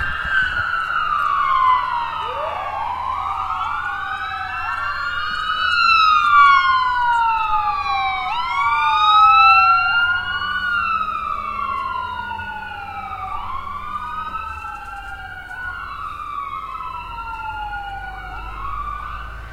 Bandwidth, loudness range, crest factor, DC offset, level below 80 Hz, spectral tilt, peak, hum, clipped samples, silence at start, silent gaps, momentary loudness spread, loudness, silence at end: 14.5 kHz; 14 LU; 18 dB; under 0.1%; -40 dBFS; -2.5 dB/octave; -2 dBFS; none; under 0.1%; 0 s; none; 18 LU; -18 LUFS; 0 s